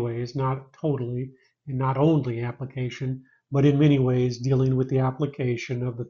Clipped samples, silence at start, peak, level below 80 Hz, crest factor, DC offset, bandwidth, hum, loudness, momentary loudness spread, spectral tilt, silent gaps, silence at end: under 0.1%; 0 s; -8 dBFS; -56 dBFS; 16 dB; under 0.1%; 7 kHz; none; -25 LUFS; 12 LU; -8 dB/octave; none; 0 s